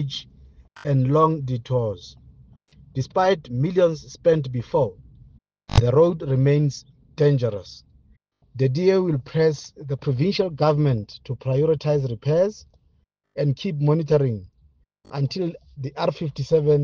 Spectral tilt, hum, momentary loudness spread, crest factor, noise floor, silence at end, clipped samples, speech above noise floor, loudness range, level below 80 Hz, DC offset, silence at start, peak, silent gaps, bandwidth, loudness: -7.5 dB/octave; none; 14 LU; 20 dB; -64 dBFS; 0 s; under 0.1%; 43 dB; 3 LU; -46 dBFS; under 0.1%; 0 s; -2 dBFS; none; 7.2 kHz; -22 LUFS